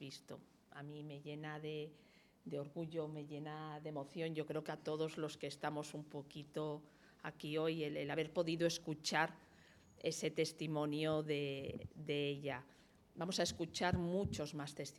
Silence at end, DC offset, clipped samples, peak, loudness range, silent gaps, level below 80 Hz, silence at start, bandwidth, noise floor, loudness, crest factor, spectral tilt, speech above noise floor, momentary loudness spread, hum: 0 s; under 0.1%; under 0.1%; -20 dBFS; 7 LU; none; -72 dBFS; 0 s; 15.5 kHz; -66 dBFS; -43 LUFS; 24 dB; -5 dB/octave; 23 dB; 13 LU; none